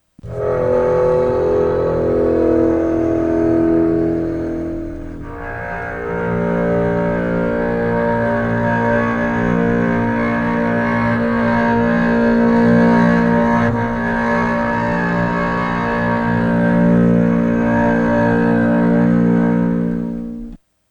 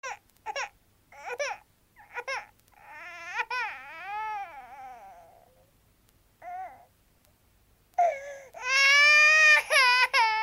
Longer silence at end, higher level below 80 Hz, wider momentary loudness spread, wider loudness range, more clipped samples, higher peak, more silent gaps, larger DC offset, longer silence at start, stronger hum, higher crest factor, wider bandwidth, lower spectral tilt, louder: first, 0.35 s vs 0 s; first, -34 dBFS vs -70 dBFS; second, 9 LU vs 27 LU; second, 5 LU vs 22 LU; neither; first, -2 dBFS vs -8 dBFS; neither; neither; first, 0.25 s vs 0.05 s; neither; second, 14 dB vs 20 dB; second, 7 kHz vs 16 kHz; first, -9 dB/octave vs 2 dB/octave; first, -16 LUFS vs -22 LUFS